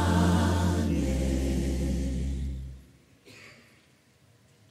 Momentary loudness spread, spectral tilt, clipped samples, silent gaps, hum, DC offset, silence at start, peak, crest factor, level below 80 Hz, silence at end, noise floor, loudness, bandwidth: 21 LU; -6.5 dB/octave; under 0.1%; none; none; under 0.1%; 0 s; -12 dBFS; 16 dB; -34 dBFS; 1.2 s; -62 dBFS; -28 LUFS; 14.5 kHz